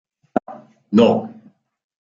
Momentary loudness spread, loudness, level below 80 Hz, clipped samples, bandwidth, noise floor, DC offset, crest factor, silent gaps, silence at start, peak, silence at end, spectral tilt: 21 LU; -18 LUFS; -62 dBFS; under 0.1%; 7.4 kHz; -49 dBFS; under 0.1%; 20 dB; none; 0.35 s; -2 dBFS; 0.85 s; -7.5 dB/octave